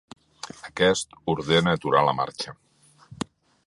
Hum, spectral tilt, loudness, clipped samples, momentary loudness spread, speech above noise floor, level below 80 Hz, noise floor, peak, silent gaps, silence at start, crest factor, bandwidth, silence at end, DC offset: none; -4.5 dB/octave; -23 LUFS; under 0.1%; 16 LU; 29 dB; -54 dBFS; -52 dBFS; -4 dBFS; none; 0.45 s; 22 dB; 11.5 kHz; 0.5 s; under 0.1%